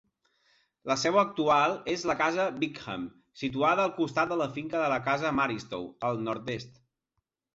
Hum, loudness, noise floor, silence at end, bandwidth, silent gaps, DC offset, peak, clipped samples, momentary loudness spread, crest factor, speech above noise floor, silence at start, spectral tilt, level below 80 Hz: none; -29 LUFS; -83 dBFS; 0.85 s; 8 kHz; none; under 0.1%; -10 dBFS; under 0.1%; 13 LU; 20 dB; 54 dB; 0.85 s; -4.5 dB/octave; -64 dBFS